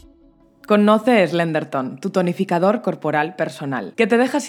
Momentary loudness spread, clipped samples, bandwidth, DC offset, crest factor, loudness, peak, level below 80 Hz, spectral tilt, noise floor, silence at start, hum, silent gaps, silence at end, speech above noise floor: 10 LU; under 0.1%; 15.5 kHz; under 0.1%; 18 dB; -19 LUFS; -2 dBFS; -64 dBFS; -6 dB/octave; -52 dBFS; 0.7 s; none; none; 0 s; 34 dB